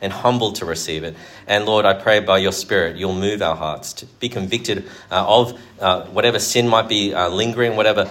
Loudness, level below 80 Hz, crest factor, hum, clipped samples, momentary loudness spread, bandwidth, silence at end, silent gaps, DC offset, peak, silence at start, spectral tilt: -18 LUFS; -52 dBFS; 18 dB; none; under 0.1%; 11 LU; 16.5 kHz; 0 s; none; under 0.1%; 0 dBFS; 0 s; -3.5 dB/octave